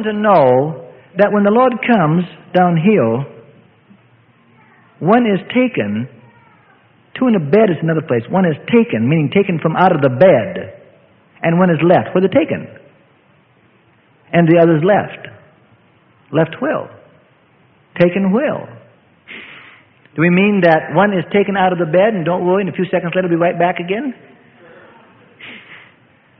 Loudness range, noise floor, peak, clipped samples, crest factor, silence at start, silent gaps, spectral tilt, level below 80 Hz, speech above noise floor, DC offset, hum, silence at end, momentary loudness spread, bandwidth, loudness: 6 LU; -52 dBFS; 0 dBFS; under 0.1%; 16 dB; 0 s; none; -10.5 dB/octave; -58 dBFS; 39 dB; under 0.1%; none; 0.65 s; 19 LU; 4.9 kHz; -14 LUFS